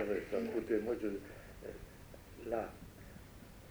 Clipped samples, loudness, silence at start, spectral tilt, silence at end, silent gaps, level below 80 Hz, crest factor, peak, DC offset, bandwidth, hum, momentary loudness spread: under 0.1%; -40 LUFS; 0 s; -6.5 dB/octave; 0 s; none; -60 dBFS; 18 dB; -22 dBFS; under 0.1%; over 20 kHz; none; 18 LU